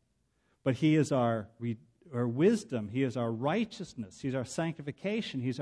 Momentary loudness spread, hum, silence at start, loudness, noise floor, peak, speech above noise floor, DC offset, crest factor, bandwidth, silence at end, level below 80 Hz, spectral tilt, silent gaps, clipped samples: 12 LU; none; 0.65 s; -32 LUFS; -75 dBFS; -14 dBFS; 44 dB; under 0.1%; 18 dB; 11 kHz; 0 s; -70 dBFS; -6.5 dB/octave; none; under 0.1%